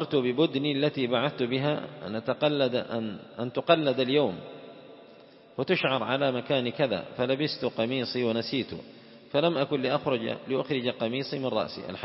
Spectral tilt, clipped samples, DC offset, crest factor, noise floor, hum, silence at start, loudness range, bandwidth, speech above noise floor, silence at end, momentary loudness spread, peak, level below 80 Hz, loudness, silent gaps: -9.5 dB/octave; under 0.1%; under 0.1%; 22 dB; -52 dBFS; none; 0 s; 2 LU; 5.8 kHz; 25 dB; 0 s; 10 LU; -6 dBFS; -70 dBFS; -28 LUFS; none